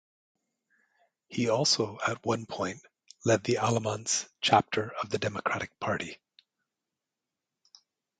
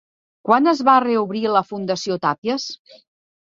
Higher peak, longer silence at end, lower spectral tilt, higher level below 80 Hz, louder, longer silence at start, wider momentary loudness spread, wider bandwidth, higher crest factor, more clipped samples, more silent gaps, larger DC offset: second, -8 dBFS vs -2 dBFS; first, 2.05 s vs 0.65 s; second, -3.5 dB/octave vs -5 dB/octave; about the same, -66 dBFS vs -66 dBFS; second, -29 LUFS vs -19 LUFS; first, 1.3 s vs 0.45 s; second, 10 LU vs 13 LU; first, 9.6 kHz vs 7.6 kHz; first, 24 dB vs 18 dB; neither; second, none vs 2.38-2.42 s; neither